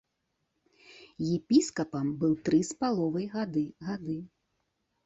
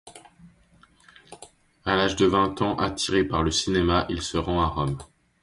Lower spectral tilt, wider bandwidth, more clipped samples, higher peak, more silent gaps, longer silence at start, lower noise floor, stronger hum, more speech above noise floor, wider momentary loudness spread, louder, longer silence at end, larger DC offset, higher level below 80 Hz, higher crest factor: first, -6 dB/octave vs -4.5 dB/octave; second, 8.2 kHz vs 11.5 kHz; neither; second, -12 dBFS vs -6 dBFS; neither; first, 0.9 s vs 0.05 s; first, -80 dBFS vs -58 dBFS; neither; first, 51 dB vs 34 dB; first, 11 LU vs 8 LU; second, -30 LUFS vs -24 LUFS; first, 0.8 s vs 0.35 s; neither; second, -66 dBFS vs -40 dBFS; about the same, 20 dB vs 20 dB